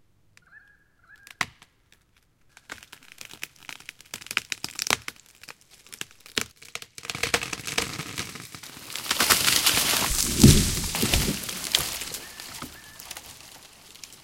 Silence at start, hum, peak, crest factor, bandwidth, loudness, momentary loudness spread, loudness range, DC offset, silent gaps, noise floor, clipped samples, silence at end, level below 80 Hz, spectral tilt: 0.55 s; none; 0 dBFS; 28 dB; 17 kHz; -24 LUFS; 25 LU; 18 LU; under 0.1%; none; -64 dBFS; under 0.1%; 0.1 s; -38 dBFS; -3 dB/octave